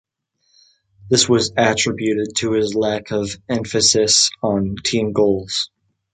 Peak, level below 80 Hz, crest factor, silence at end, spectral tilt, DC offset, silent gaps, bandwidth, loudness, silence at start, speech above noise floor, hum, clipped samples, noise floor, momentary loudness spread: 0 dBFS; -48 dBFS; 18 dB; 0.45 s; -3 dB/octave; under 0.1%; none; 9.6 kHz; -17 LUFS; 1.05 s; 49 dB; none; under 0.1%; -67 dBFS; 10 LU